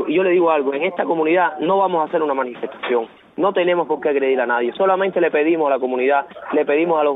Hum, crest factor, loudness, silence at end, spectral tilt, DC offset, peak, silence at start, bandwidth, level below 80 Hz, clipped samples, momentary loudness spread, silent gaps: none; 14 dB; -18 LUFS; 0 s; -8.5 dB/octave; under 0.1%; -4 dBFS; 0 s; 4 kHz; -70 dBFS; under 0.1%; 5 LU; none